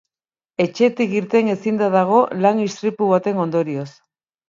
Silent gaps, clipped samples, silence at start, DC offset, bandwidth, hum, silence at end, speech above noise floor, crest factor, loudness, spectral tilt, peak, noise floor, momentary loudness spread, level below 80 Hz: none; under 0.1%; 0.6 s; under 0.1%; 7.6 kHz; none; 0.6 s; over 72 dB; 16 dB; -18 LUFS; -7 dB/octave; -2 dBFS; under -90 dBFS; 9 LU; -68 dBFS